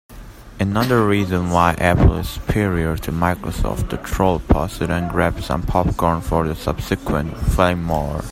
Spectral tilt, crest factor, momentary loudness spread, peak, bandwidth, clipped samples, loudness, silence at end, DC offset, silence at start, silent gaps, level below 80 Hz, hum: -6.5 dB/octave; 18 dB; 8 LU; 0 dBFS; 16 kHz; under 0.1%; -19 LUFS; 0 s; under 0.1%; 0.1 s; none; -28 dBFS; none